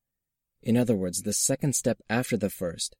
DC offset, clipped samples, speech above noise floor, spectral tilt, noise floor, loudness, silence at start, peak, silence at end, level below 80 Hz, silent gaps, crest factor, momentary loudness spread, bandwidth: under 0.1%; under 0.1%; 58 dB; -4.5 dB/octave; -85 dBFS; -27 LUFS; 0.65 s; -12 dBFS; 0.1 s; -60 dBFS; none; 16 dB; 6 LU; 16.5 kHz